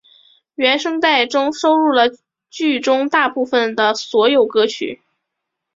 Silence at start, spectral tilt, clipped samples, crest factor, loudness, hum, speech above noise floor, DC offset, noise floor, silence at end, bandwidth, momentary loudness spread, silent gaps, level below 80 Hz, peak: 0.6 s; -2.5 dB/octave; under 0.1%; 16 dB; -16 LUFS; none; 63 dB; under 0.1%; -78 dBFS; 0.8 s; 7.8 kHz; 7 LU; none; -64 dBFS; 0 dBFS